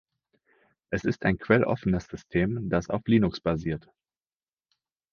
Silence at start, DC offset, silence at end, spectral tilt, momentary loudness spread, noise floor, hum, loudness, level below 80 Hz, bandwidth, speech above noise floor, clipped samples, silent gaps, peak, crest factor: 0.9 s; under 0.1%; 1.35 s; -7.5 dB/octave; 8 LU; under -90 dBFS; none; -27 LUFS; -48 dBFS; 7 kHz; over 64 dB; under 0.1%; none; -4 dBFS; 24 dB